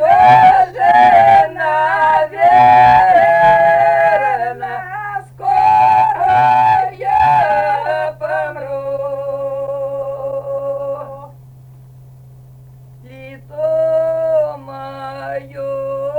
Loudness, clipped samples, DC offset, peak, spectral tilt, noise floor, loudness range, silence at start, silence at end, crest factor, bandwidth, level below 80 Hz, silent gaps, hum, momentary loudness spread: -12 LUFS; under 0.1%; under 0.1%; 0 dBFS; -6 dB/octave; -39 dBFS; 15 LU; 0 s; 0 s; 12 dB; 9.6 kHz; -48 dBFS; none; none; 17 LU